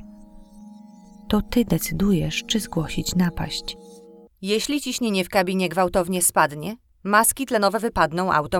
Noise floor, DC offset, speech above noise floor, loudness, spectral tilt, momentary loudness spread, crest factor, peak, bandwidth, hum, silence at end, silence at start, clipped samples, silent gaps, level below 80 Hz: -45 dBFS; under 0.1%; 24 dB; -22 LUFS; -4 dB/octave; 10 LU; 20 dB; -4 dBFS; 18.5 kHz; none; 0 s; 0 s; under 0.1%; none; -42 dBFS